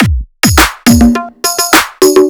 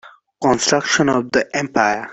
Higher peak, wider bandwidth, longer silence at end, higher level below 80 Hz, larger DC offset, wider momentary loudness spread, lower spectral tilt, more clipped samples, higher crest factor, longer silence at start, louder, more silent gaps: about the same, 0 dBFS vs -2 dBFS; first, over 20 kHz vs 8.4 kHz; about the same, 0 s vs 0 s; first, -20 dBFS vs -54 dBFS; neither; about the same, 6 LU vs 4 LU; about the same, -4 dB/octave vs -3.5 dB/octave; first, 3% vs under 0.1%; second, 8 dB vs 16 dB; about the same, 0 s vs 0.05 s; first, -8 LUFS vs -17 LUFS; neither